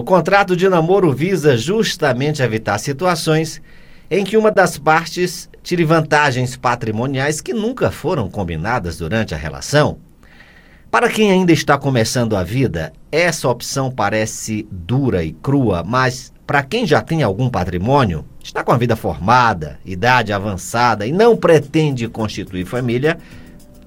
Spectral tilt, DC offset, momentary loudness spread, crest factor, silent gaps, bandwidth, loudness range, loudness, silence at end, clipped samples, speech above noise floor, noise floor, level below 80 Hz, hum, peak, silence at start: -5.5 dB/octave; under 0.1%; 9 LU; 16 dB; none; 17 kHz; 4 LU; -16 LUFS; 0.05 s; under 0.1%; 28 dB; -44 dBFS; -40 dBFS; none; 0 dBFS; 0 s